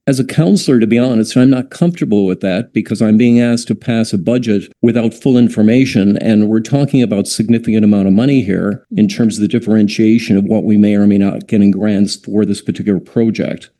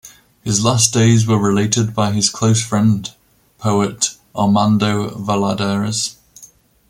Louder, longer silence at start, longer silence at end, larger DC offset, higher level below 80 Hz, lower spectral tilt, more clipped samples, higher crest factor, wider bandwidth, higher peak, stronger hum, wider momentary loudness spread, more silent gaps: first, -12 LUFS vs -16 LUFS; about the same, 0.05 s vs 0.05 s; second, 0.15 s vs 0.45 s; neither; about the same, -52 dBFS vs -50 dBFS; first, -7 dB/octave vs -4.5 dB/octave; neither; about the same, 12 dB vs 16 dB; second, 12.5 kHz vs 16 kHz; about the same, 0 dBFS vs 0 dBFS; neither; about the same, 6 LU vs 8 LU; neither